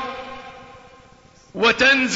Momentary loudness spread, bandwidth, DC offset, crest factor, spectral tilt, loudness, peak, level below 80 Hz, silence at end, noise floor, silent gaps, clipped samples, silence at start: 23 LU; 8 kHz; under 0.1%; 18 dB; -2.5 dB/octave; -17 LUFS; -4 dBFS; -52 dBFS; 0 s; -50 dBFS; none; under 0.1%; 0 s